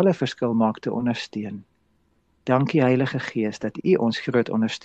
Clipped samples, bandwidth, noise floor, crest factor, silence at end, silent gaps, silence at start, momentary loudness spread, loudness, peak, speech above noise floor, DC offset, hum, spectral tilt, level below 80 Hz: under 0.1%; 8.2 kHz; -66 dBFS; 18 dB; 0.05 s; none; 0 s; 12 LU; -23 LUFS; -6 dBFS; 43 dB; under 0.1%; none; -7 dB/octave; -64 dBFS